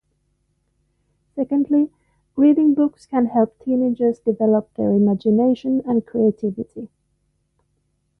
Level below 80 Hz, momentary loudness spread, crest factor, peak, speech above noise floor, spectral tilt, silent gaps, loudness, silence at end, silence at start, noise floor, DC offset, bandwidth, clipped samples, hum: -60 dBFS; 12 LU; 14 dB; -6 dBFS; 50 dB; -10 dB/octave; none; -19 LUFS; 1.35 s; 1.35 s; -68 dBFS; under 0.1%; 5.8 kHz; under 0.1%; none